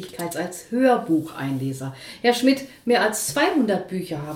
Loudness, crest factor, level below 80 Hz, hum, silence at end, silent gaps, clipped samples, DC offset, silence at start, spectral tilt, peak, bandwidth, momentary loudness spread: -22 LUFS; 16 dB; -62 dBFS; none; 0 s; none; under 0.1%; under 0.1%; 0 s; -4.5 dB/octave; -6 dBFS; 17 kHz; 10 LU